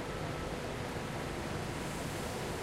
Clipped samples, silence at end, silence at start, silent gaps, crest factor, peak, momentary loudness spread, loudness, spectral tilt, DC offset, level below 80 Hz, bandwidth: under 0.1%; 0 s; 0 s; none; 12 dB; -26 dBFS; 1 LU; -39 LUFS; -5 dB/octave; under 0.1%; -50 dBFS; 16 kHz